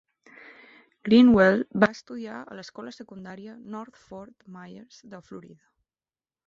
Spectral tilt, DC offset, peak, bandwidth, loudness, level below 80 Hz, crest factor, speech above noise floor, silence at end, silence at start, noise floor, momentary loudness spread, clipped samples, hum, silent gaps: -7 dB/octave; under 0.1%; -6 dBFS; 7.2 kHz; -20 LUFS; -58 dBFS; 20 dB; over 65 dB; 1.1 s; 1.05 s; under -90 dBFS; 28 LU; under 0.1%; none; none